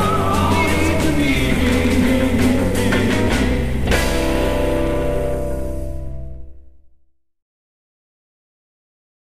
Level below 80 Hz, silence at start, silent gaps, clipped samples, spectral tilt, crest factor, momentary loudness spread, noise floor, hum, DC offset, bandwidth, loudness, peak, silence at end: -26 dBFS; 0 s; none; under 0.1%; -5.5 dB/octave; 16 dB; 11 LU; -56 dBFS; none; 5%; 15.5 kHz; -18 LUFS; -2 dBFS; 1.9 s